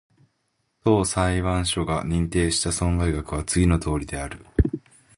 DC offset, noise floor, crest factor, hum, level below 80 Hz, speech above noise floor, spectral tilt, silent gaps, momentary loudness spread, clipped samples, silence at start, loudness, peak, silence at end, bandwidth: under 0.1%; -73 dBFS; 18 dB; none; -32 dBFS; 50 dB; -5 dB/octave; none; 7 LU; under 0.1%; 0.85 s; -23 LUFS; -6 dBFS; 0.4 s; 11.5 kHz